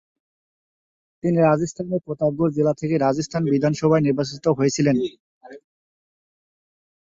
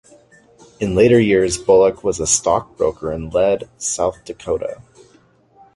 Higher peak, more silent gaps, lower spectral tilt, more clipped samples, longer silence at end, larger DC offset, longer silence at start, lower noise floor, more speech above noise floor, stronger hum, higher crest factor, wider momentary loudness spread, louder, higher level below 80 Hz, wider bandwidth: second, -6 dBFS vs -2 dBFS; first, 5.20-5.41 s vs none; first, -6.5 dB/octave vs -4.5 dB/octave; neither; first, 1.45 s vs 1 s; neither; first, 1.25 s vs 0.8 s; first, under -90 dBFS vs -53 dBFS; first, over 70 dB vs 36 dB; neither; about the same, 16 dB vs 16 dB; second, 7 LU vs 12 LU; second, -21 LUFS vs -17 LUFS; second, -58 dBFS vs -42 dBFS; second, 7.8 kHz vs 11.5 kHz